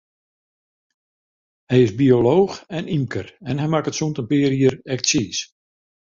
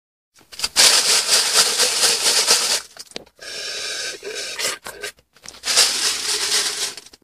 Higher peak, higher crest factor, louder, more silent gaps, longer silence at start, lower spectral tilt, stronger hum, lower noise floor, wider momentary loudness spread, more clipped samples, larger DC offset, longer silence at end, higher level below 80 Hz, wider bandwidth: about the same, -2 dBFS vs 0 dBFS; about the same, 18 dB vs 20 dB; second, -20 LUFS vs -16 LUFS; neither; first, 1.7 s vs 0.5 s; first, -5.5 dB/octave vs 2 dB/octave; neither; first, under -90 dBFS vs -43 dBFS; second, 12 LU vs 19 LU; neither; neither; first, 0.7 s vs 0.25 s; first, -54 dBFS vs -60 dBFS; second, 7.6 kHz vs 15.5 kHz